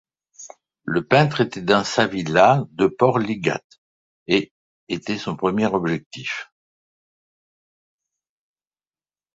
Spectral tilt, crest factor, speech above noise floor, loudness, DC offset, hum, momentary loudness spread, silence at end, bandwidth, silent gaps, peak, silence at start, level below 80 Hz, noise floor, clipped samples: -5.5 dB/octave; 22 dB; over 70 dB; -21 LUFS; under 0.1%; none; 15 LU; 2.9 s; 8 kHz; 3.64-3.70 s, 3.78-4.26 s, 4.51-4.87 s, 6.06-6.11 s; -2 dBFS; 0.4 s; -58 dBFS; under -90 dBFS; under 0.1%